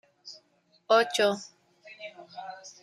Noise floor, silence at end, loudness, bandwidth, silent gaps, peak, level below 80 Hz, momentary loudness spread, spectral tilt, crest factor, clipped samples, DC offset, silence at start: -67 dBFS; 0.15 s; -25 LUFS; 15 kHz; none; -10 dBFS; -82 dBFS; 23 LU; -2.5 dB/octave; 22 dB; under 0.1%; under 0.1%; 0.25 s